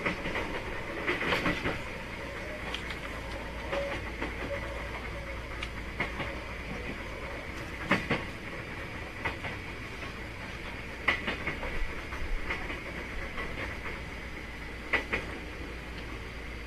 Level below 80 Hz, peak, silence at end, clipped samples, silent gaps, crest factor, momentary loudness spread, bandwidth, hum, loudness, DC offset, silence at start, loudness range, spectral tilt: -42 dBFS; -12 dBFS; 0 s; under 0.1%; none; 24 dB; 10 LU; 14 kHz; none; -35 LUFS; under 0.1%; 0 s; 3 LU; -5 dB/octave